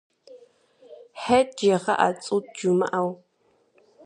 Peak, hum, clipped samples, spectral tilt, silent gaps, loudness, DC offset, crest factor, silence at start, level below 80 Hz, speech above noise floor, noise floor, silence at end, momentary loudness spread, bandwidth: -6 dBFS; none; under 0.1%; -5 dB/octave; none; -23 LUFS; under 0.1%; 20 dB; 0.3 s; -64 dBFS; 43 dB; -66 dBFS; 0.9 s; 12 LU; 11 kHz